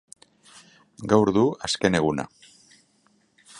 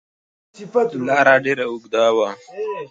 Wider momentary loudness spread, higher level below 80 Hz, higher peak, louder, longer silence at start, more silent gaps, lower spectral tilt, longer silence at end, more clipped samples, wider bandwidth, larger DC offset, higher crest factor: about the same, 15 LU vs 13 LU; first, -54 dBFS vs -68 dBFS; second, -4 dBFS vs 0 dBFS; second, -22 LUFS vs -18 LUFS; first, 1 s vs 0.6 s; neither; about the same, -5 dB/octave vs -4.5 dB/octave; about the same, 0 s vs 0.05 s; neither; first, 11.5 kHz vs 7.8 kHz; neither; about the same, 22 dB vs 18 dB